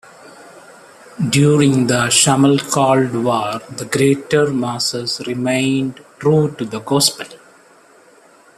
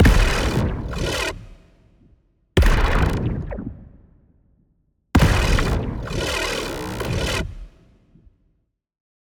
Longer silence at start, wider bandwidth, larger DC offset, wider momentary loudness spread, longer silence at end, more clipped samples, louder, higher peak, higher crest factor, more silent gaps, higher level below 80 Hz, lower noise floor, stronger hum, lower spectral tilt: first, 0.25 s vs 0 s; second, 14.5 kHz vs 19.5 kHz; neither; second, 11 LU vs 15 LU; second, 1.2 s vs 1.55 s; neither; first, -16 LUFS vs -22 LUFS; first, 0 dBFS vs -4 dBFS; about the same, 18 dB vs 18 dB; neither; second, -56 dBFS vs -26 dBFS; second, -48 dBFS vs -69 dBFS; neither; about the same, -4.5 dB/octave vs -5 dB/octave